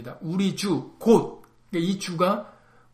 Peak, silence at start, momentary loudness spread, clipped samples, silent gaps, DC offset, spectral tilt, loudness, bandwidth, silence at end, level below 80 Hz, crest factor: -6 dBFS; 0 s; 10 LU; under 0.1%; none; under 0.1%; -6 dB/octave; -25 LUFS; 15.5 kHz; 0.45 s; -60 dBFS; 20 dB